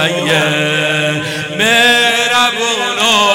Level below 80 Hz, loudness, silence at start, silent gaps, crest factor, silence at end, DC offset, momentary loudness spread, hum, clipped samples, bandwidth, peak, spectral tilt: -54 dBFS; -11 LUFS; 0 s; none; 12 dB; 0 s; under 0.1%; 6 LU; none; under 0.1%; 17.5 kHz; 0 dBFS; -2.5 dB/octave